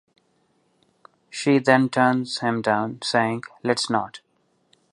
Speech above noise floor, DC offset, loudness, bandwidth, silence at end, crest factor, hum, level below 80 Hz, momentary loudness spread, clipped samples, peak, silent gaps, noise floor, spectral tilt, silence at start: 46 dB; under 0.1%; -22 LUFS; 11 kHz; 0.75 s; 22 dB; none; -70 dBFS; 9 LU; under 0.1%; -2 dBFS; none; -67 dBFS; -5 dB/octave; 1.35 s